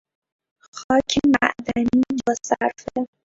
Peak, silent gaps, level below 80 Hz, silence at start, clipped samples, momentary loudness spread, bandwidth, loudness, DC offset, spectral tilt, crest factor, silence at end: 0 dBFS; 0.84-0.89 s; -50 dBFS; 0.75 s; under 0.1%; 10 LU; 7.8 kHz; -21 LUFS; under 0.1%; -4 dB/octave; 22 dB; 0.2 s